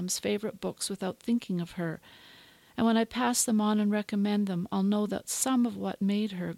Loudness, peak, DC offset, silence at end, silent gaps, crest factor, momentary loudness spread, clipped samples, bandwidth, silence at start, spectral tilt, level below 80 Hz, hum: -29 LUFS; -14 dBFS; under 0.1%; 0 s; none; 16 dB; 9 LU; under 0.1%; 16 kHz; 0 s; -4.5 dB/octave; -66 dBFS; none